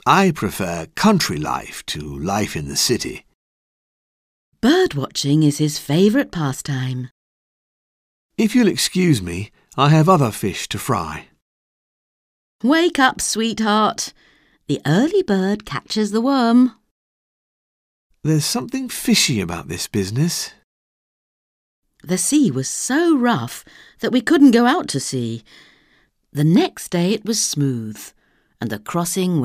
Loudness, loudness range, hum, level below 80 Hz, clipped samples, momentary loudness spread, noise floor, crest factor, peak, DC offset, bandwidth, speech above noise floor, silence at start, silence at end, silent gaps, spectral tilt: -18 LUFS; 4 LU; none; -50 dBFS; under 0.1%; 13 LU; -60 dBFS; 18 dB; -2 dBFS; under 0.1%; 16 kHz; 42 dB; 0.05 s; 0 s; 3.34-4.52 s, 7.11-8.29 s, 11.42-12.59 s, 16.91-18.10 s, 20.64-21.82 s; -4.5 dB/octave